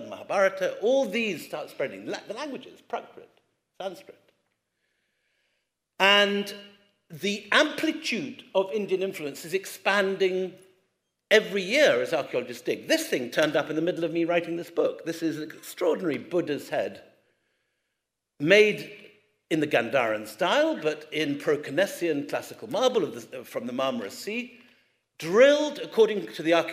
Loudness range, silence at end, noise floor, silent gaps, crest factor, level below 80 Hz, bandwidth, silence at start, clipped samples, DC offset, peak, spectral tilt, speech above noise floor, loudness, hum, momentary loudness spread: 7 LU; 0 s; -83 dBFS; none; 22 dB; -82 dBFS; 16 kHz; 0 s; under 0.1%; under 0.1%; -4 dBFS; -4 dB/octave; 57 dB; -26 LUFS; none; 15 LU